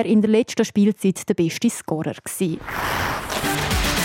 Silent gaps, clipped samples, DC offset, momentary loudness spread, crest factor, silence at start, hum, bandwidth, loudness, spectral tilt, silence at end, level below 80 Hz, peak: none; under 0.1%; under 0.1%; 7 LU; 16 dB; 0 s; none; 17.5 kHz; -21 LUFS; -4.5 dB/octave; 0 s; -36 dBFS; -6 dBFS